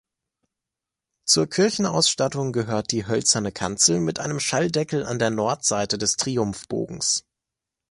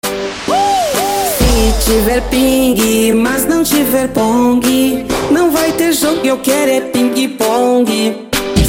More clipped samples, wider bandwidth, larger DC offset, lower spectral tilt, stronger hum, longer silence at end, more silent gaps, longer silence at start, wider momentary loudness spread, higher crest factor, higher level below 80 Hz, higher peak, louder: neither; second, 11.5 kHz vs 17 kHz; neither; about the same, -3 dB/octave vs -4 dB/octave; neither; first, 0.7 s vs 0 s; neither; first, 1.25 s vs 0.05 s; first, 7 LU vs 3 LU; first, 20 dB vs 12 dB; second, -56 dBFS vs -24 dBFS; second, -4 dBFS vs 0 dBFS; second, -22 LUFS vs -12 LUFS